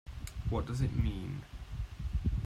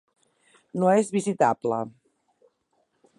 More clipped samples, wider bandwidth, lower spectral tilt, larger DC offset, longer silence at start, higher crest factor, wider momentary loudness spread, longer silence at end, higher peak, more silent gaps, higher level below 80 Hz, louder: neither; first, 14.5 kHz vs 11.5 kHz; about the same, -7.5 dB/octave vs -6.5 dB/octave; neither; second, 0.05 s vs 0.75 s; about the same, 16 dB vs 20 dB; about the same, 11 LU vs 13 LU; second, 0 s vs 1.3 s; second, -20 dBFS vs -8 dBFS; neither; first, -40 dBFS vs -76 dBFS; second, -37 LUFS vs -24 LUFS